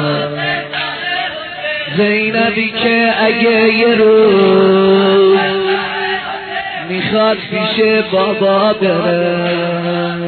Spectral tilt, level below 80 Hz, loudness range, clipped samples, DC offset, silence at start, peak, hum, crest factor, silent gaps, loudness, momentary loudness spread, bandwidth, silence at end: -9 dB/octave; -54 dBFS; 4 LU; under 0.1%; under 0.1%; 0 s; 0 dBFS; none; 12 dB; none; -13 LUFS; 10 LU; 4.5 kHz; 0 s